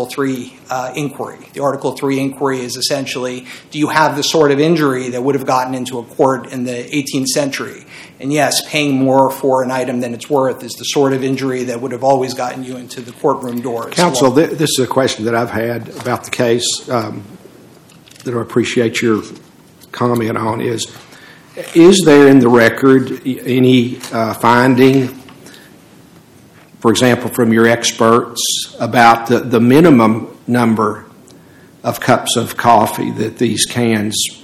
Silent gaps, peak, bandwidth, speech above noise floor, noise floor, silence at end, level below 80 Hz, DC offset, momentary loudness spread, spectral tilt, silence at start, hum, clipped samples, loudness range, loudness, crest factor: none; 0 dBFS; 16 kHz; 30 dB; -43 dBFS; 0.05 s; -56 dBFS; under 0.1%; 13 LU; -4.5 dB/octave; 0 s; none; 0.5%; 7 LU; -14 LUFS; 14 dB